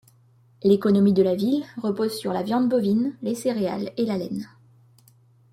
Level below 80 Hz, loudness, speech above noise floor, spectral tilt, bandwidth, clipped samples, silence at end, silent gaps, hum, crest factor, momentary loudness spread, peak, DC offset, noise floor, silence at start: -66 dBFS; -23 LUFS; 35 dB; -7 dB/octave; 14.5 kHz; under 0.1%; 1.05 s; none; none; 18 dB; 10 LU; -6 dBFS; under 0.1%; -57 dBFS; 0.65 s